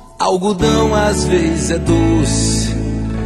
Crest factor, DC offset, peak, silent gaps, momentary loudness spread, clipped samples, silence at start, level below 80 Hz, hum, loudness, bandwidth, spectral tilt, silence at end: 14 dB; under 0.1%; 0 dBFS; none; 5 LU; under 0.1%; 0 s; -24 dBFS; none; -15 LUFS; 12.5 kHz; -5 dB/octave; 0 s